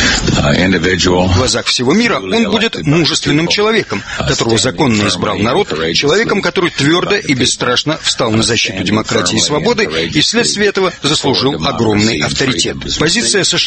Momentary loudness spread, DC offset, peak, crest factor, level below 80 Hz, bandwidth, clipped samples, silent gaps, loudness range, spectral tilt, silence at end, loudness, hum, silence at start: 3 LU; under 0.1%; 0 dBFS; 12 dB; -34 dBFS; 8.8 kHz; under 0.1%; none; 1 LU; -3.5 dB/octave; 0 s; -12 LUFS; none; 0 s